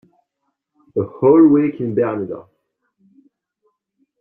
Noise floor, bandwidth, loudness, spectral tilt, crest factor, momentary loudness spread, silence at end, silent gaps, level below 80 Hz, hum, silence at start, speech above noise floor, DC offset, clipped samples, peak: -74 dBFS; 2.9 kHz; -16 LUFS; -12.5 dB/octave; 16 dB; 16 LU; 1.8 s; none; -62 dBFS; none; 0.95 s; 59 dB; under 0.1%; under 0.1%; -2 dBFS